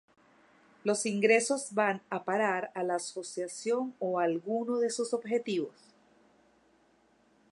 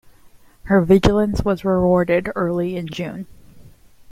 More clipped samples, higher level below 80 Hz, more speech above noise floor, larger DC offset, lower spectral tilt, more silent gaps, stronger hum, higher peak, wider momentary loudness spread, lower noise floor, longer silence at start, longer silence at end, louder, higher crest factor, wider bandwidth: neither; second, -86 dBFS vs -36 dBFS; first, 36 dB vs 30 dB; neither; second, -4 dB/octave vs -7.5 dB/octave; neither; neither; second, -12 dBFS vs 0 dBFS; second, 10 LU vs 14 LU; first, -67 dBFS vs -48 dBFS; first, 0.85 s vs 0.65 s; first, 1.8 s vs 0 s; second, -31 LUFS vs -18 LUFS; about the same, 20 dB vs 20 dB; second, 11.5 kHz vs 14.5 kHz